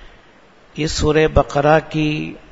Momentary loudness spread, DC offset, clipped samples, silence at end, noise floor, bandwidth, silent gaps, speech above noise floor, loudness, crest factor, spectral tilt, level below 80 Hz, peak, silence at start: 10 LU; under 0.1%; under 0.1%; 0.15 s; -49 dBFS; 8 kHz; none; 32 dB; -17 LUFS; 18 dB; -5.5 dB/octave; -32 dBFS; 0 dBFS; 0.05 s